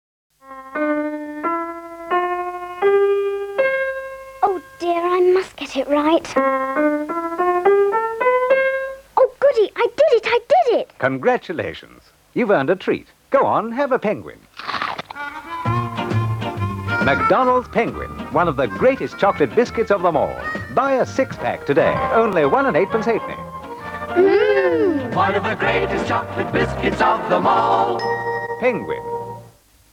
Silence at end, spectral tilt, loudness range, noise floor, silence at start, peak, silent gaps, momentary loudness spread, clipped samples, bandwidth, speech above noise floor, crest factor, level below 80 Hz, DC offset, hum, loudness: 0.45 s; -6.5 dB/octave; 4 LU; -48 dBFS; 0.45 s; -4 dBFS; none; 11 LU; under 0.1%; 15.5 kHz; 30 dB; 14 dB; -46 dBFS; under 0.1%; none; -19 LUFS